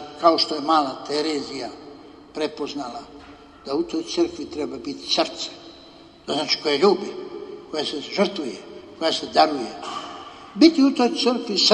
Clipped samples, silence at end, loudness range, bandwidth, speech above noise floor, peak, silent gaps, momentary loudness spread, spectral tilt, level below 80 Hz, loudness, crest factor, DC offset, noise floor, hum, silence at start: under 0.1%; 0 s; 8 LU; 10.5 kHz; 25 dB; -2 dBFS; none; 19 LU; -3.5 dB/octave; -60 dBFS; -22 LUFS; 22 dB; under 0.1%; -47 dBFS; none; 0 s